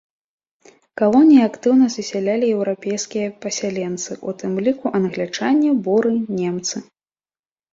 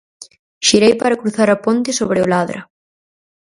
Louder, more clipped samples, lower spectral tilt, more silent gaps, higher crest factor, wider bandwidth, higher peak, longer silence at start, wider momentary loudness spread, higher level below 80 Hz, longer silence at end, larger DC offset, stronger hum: second, -19 LUFS vs -15 LUFS; neither; about the same, -5 dB/octave vs -4 dB/octave; second, none vs 0.39-0.61 s; about the same, 16 dB vs 16 dB; second, 7.8 kHz vs 11.5 kHz; about the same, -2 dBFS vs 0 dBFS; first, 0.95 s vs 0.2 s; first, 12 LU vs 7 LU; second, -64 dBFS vs -54 dBFS; about the same, 0.9 s vs 0.85 s; neither; neither